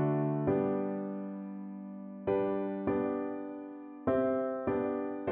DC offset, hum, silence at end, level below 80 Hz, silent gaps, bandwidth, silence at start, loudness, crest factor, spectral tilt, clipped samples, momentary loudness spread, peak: under 0.1%; none; 0 s; -64 dBFS; none; 3.8 kHz; 0 s; -34 LUFS; 14 dB; -9 dB/octave; under 0.1%; 13 LU; -20 dBFS